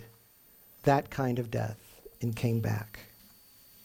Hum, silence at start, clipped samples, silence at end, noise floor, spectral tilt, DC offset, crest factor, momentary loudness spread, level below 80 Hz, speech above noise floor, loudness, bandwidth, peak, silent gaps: none; 0 s; under 0.1%; 0.8 s; -60 dBFS; -7 dB/octave; under 0.1%; 22 dB; 21 LU; -58 dBFS; 30 dB; -32 LUFS; 17 kHz; -10 dBFS; none